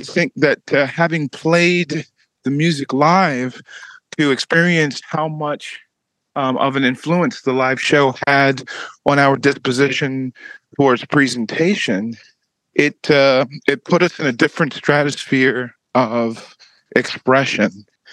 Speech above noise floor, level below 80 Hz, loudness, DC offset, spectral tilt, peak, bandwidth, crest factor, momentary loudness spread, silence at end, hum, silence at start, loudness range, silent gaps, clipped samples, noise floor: 40 dB; -66 dBFS; -17 LUFS; under 0.1%; -5.5 dB/octave; 0 dBFS; 11.5 kHz; 18 dB; 12 LU; 0.3 s; none; 0 s; 3 LU; none; under 0.1%; -57 dBFS